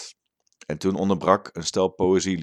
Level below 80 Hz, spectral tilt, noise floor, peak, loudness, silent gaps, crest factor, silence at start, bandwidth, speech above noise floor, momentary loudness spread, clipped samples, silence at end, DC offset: -56 dBFS; -5 dB/octave; -66 dBFS; -2 dBFS; -23 LUFS; none; 22 dB; 0 s; 11 kHz; 43 dB; 15 LU; under 0.1%; 0 s; under 0.1%